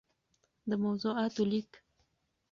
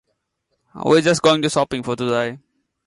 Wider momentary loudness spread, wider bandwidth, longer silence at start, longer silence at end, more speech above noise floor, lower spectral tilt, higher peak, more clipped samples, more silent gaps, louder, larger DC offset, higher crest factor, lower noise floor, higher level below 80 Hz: about the same, 10 LU vs 9 LU; second, 7.2 kHz vs 11.5 kHz; about the same, 0.65 s vs 0.75 s; first, 0.75 s vs 0.5 s; second, 45 dB vs 55 dB; first, -6.5 dB/octave vs -4.5 dB/octave; second, -20 dBFS vs -4 dBFS; neither; neither; second, -33 LUFS vs -18 LUFS; neither; about the same, 16 dB vs 16 dB; first, -77 dBFS vs -73 dBFS; second, -74 dBFS vs -56 dBFS